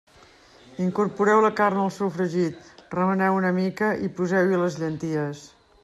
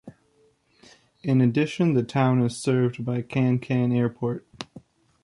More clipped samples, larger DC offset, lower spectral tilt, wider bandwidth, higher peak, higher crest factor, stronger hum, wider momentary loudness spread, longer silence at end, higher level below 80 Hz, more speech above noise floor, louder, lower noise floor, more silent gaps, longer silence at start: neither; neither; about the same, -7 dB/octave vs -7.5 dB/octave; about the same, 12 kHz vs 11.5 kHz; about the same, -8 dBFS vs -10 dBFS; about the same, 16 dB vs 16 dB; neither; second, 10 LU vs 13 LU; about the same, 0.4 s vs 0.45 s; about the same, -64 dBFS vs -62 dBFS; second, 30 dB vs 41 dB; about the same, -24 LUFS vs -24 LUFS; second, -53 dBFS vs -63 dBFS; neither; first, 0.7 s vs 0.05 s